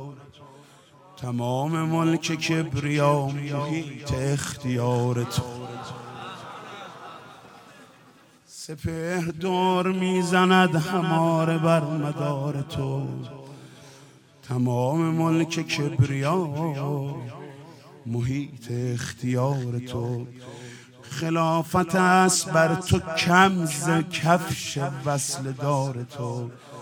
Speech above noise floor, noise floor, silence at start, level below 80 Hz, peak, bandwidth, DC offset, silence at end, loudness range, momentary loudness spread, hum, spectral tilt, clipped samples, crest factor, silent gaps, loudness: 30 dB; -54 dBFS; 0 s; -58 dBFS; -2 dBFS; 19.5 kHz; under 0.1%; 0 s; 9 LU; 19 LU; none; -5.5 dB/octave; under 0.1%; 22 dB; none; -24 LUFS